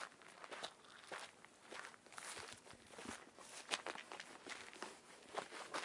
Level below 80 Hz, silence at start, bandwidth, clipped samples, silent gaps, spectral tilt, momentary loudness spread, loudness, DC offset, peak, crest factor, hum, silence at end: -86 dBFS; 0 s; 12 kHz; under 0.1%; none; -1 dB/octave; 12 LU; -52 LUFS; under 0.1%; -16 dBFS; 36 dB; none; 0 s